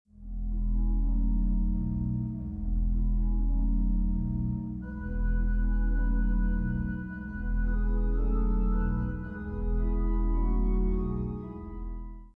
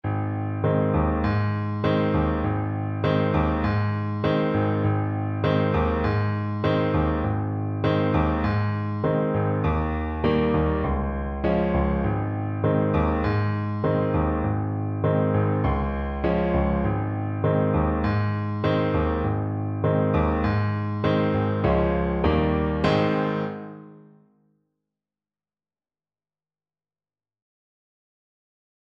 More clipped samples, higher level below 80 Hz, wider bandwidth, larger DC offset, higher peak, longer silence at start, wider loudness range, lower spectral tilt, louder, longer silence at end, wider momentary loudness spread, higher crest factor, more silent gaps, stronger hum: neither; first, -28 dBFS vs -34 dBFS; second, 2.1 kHz vs 5.8 kHz; neither; second, -18 dBFS vs -6 dBFS; first, 0.2 s vs 0.05 s; about the same, 1 LU vs 1 LU; first, -12 dB/octave vs -9.5 dB/octave; second, -32 LUFS vs -24 LUFS; second, 0.1 s vs 4.9 s; about the same, 7 LU vs 5 LU; second, 10 dB vs 18 dB; neither; neither